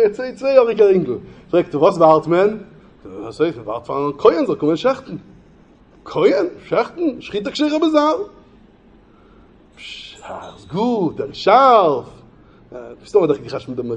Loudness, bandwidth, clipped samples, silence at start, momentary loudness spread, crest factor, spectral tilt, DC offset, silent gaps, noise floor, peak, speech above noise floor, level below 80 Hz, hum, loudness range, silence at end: -17 LUFS; 9.2 kHz; under 0.1%; 0 s; 21 LU; 18 dB; -6.5 dB/octave; under 0.1%; none; -49 dBFS; 0 dBFS; 32 dB; -54 dBFS; none; 6 LU; 0 s